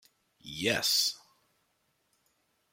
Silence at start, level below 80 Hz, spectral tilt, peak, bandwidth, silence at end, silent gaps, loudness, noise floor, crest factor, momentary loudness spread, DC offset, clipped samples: 0.45 s; -70 dBFS; -1.5 dB/octave; -14 dBFS; 16.5 kHz; 1.55 s; none; -28 LUFS; -76 dBFS; 22 dB; 18 LU; under 0.1%; under 0.1%